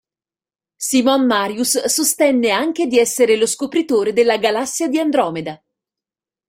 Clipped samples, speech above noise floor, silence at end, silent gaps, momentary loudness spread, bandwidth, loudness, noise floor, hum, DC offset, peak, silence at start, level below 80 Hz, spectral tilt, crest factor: under 0.1%; over 74 dB; 0.95 s; none; 5 LU; 16.5 kHz; -16 LUFS; under -90 dBFS; none; under 0.1%; -2 dBFS; 0.8 s; -62 dBFS; -2.5 dB/octave; 16 dB